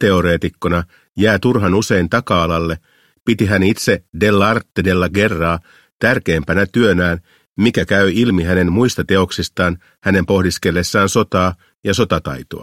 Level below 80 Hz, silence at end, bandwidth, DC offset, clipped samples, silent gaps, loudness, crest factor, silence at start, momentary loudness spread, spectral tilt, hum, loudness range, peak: -38 dBFS; 0 s; 16 kHz; 0.2%; under 0.1%; 1.09-1.13 s, 3.21-3.26 s, 5.92-6.00 s, 7.46-7.56 s, 9.98-10.02 s, 11.78-11.83 s; -16 LUFS; 16 dB; 0 s; 6 LU; -5.5 dB/octave; none; 1 LU; 0 dBFS